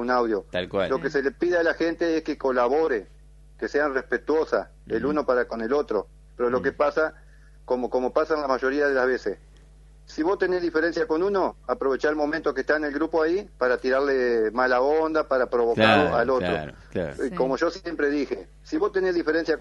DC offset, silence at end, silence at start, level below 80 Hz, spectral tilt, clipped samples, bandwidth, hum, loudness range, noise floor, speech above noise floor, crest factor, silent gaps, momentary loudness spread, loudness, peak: under 0.1%; 0 s; 0 s; -50 dBFS; -6 dB/octave; under 0.1%; 11 kHz; none; 4 LU; -50 dBFS; 26 dB; 22 dB; none; 7 LU; -24 LUFS; -2 dBFS